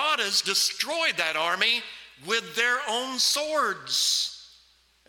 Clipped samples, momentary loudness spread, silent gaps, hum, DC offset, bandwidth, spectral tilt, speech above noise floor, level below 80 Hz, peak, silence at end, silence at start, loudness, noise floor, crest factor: under 0.1%; 6 LU; none; none; under 0.1%; 18 kHz; 0.5 dB/octave; 35 dB; -72 dBFS; -6 dBFS; 0.6 s; 0 s; -24 LUFS; -61 dBFS; 20 dB